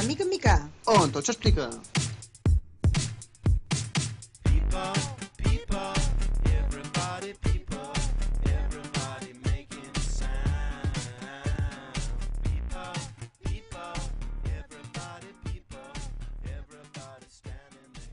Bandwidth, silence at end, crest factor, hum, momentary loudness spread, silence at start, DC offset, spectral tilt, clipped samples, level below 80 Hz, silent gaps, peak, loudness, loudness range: 11 kHz; 0 s; 20 dB; none; 16 LU; 0 s; under 0.1%; -5 dB/octave; under 0.1%; -32 dBFS; none; -8 dBFS; -30 LUFS; 12 LU